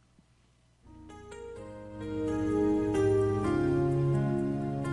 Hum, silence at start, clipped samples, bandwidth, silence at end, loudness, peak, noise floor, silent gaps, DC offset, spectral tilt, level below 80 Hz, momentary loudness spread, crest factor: none; 0.85 s; under 0.1%; 11.5 kHz; 0 s; -29 LUFS; -18 dBFS; -65 dBFS; none; under 0.1%; -8.5 dB/octave; -50 dBFS; 18 LU; 14 dB